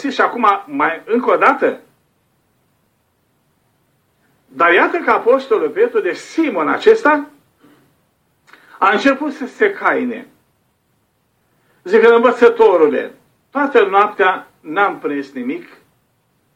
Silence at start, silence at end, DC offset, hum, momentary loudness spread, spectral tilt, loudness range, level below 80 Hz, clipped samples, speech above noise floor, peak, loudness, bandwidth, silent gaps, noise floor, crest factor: 0 s; 0.95 s; under 0.1%; none; 14 LU; -4.5 dB/octave; 6 LU; -66 dBFS; under 0.1%; 49 dB; 0 dBFS; -14 LUFS; 9 kHz; none; -63 dBFS; 16 dB